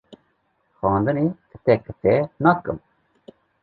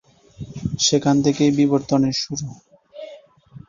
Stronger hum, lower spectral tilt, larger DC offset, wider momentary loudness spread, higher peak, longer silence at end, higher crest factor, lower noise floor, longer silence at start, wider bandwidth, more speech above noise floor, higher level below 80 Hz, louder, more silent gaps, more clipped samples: neither; first, -11 dB/octave vs -5 dB/octave; neither; second, 7 LU vs 22 LU; about the same, -2 dBFS vs -4 dBFS; first, 0.85 s vs 0.1 s; about the same, 20 dB vs 16 dB; first, -68 dBFS vs -45 dBFS; second, 0.1 s vs 0.4 s; second, 4.9 kHz vs 7.4 kHz; first, 47 dB vs 26 dB; about the same, -50 dBFS vs -50 dBFS; about the same, -21 LUFS vs -19 LUFS; neither; neither